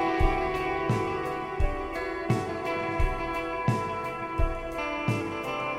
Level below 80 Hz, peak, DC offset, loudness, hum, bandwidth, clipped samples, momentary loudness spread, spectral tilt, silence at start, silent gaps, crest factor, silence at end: -34 dBFS; -12 dBFS; under 0.1%; -30 LUFS; none; 15 kHz; under 0.1%; 5 LU; -6.5 dB/octave; 0 s; none; 18 dB; 0 s